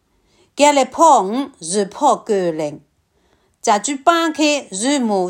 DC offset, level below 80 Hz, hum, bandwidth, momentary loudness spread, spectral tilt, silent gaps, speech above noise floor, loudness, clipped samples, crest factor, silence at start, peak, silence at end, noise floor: under 0.1%; -64 dBFS; none; 16.5 kHz; 11 LU; -3 dB/octave; none; 45 dB; -16 LUFS; under 0.1%; 16 dB; 0.55 s; 0 dBFS; 0 s; -61 dBFS